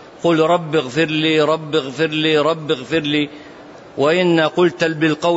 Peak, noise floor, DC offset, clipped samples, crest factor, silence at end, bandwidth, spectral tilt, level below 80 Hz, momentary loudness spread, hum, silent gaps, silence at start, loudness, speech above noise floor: -4 dBFS; -38 dBFS; under 0.1%; under 0.1%; 14 dB; 0 s; 8 kHz; -5.5 dB/octave; -60 dBFS; 6 LU; none; none; 0 s; -17 LUFS; 22 dB